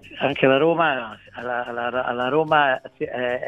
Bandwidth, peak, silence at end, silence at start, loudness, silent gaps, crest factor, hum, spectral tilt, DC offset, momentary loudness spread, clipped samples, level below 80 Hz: 7.6 kHz; -2 dBFS; 0 s; 0.05 s; -21 LUFS; none; 20 dB; none; -7 dB/octave; under 0.1%; 11 LU; under 0.1%; -60 dBFS